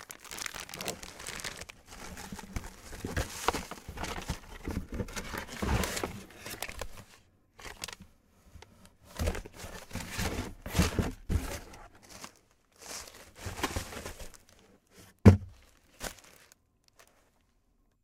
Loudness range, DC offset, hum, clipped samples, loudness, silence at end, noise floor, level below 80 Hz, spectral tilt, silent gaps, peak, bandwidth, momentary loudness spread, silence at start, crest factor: 11 LU; under 0.1%; none; under 0.1%; -35 LUFS; 1.75 s; -70 dBFS; -44 dBFS; -5 dB/octave; none; -4 dBFS; 17.5 kHz; 18 LU; 0 s; 30 dB